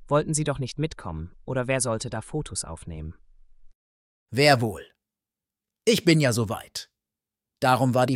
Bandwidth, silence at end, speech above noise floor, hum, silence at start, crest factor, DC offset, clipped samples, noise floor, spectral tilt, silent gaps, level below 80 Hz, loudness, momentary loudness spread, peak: 16.5 kHz; 0 s; 65 dB; none; 0 s; 22 dB; under 0.1%; under 0.1%; -89 dBFS; -4.5 dB/octave; 3.75-4.26 s; -50 dBFS; -24 LUFS; 17 LU; -4 dBFS